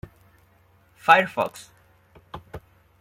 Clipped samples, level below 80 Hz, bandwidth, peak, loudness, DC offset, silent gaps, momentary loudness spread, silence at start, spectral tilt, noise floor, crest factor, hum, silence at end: under 0.1%; -58 dBFS; 16.5 kHz; -2 dBFS; -21 LUFS; under 0.1%; none; 27 LU; 1.05 s; -4 dB/octave; -59 dBFS; 24 dB; none; 0.4 s